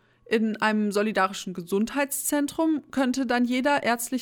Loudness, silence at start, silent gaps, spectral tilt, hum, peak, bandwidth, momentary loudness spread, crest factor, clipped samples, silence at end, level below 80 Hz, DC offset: -25 LUFS; 0.3 s; none; -4 dB/octave; none; -10 dBFS; 19 kHz; 4 LU; 14 dB; under 0.1%; 0 s; -64 dBFS; under 0.1%